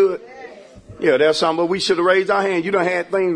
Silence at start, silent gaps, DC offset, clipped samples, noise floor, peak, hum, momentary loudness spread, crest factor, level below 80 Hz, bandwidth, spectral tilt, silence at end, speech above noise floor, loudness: 0 s; none; under 0.1%; under 0.1%; -40 dBFS; -4 dBFS; none; 10 LU; 14 dB; -58 dBFS; 10.5 kHz; -4.5 dB/octave; 0 s; 23 dB; -17 LUFS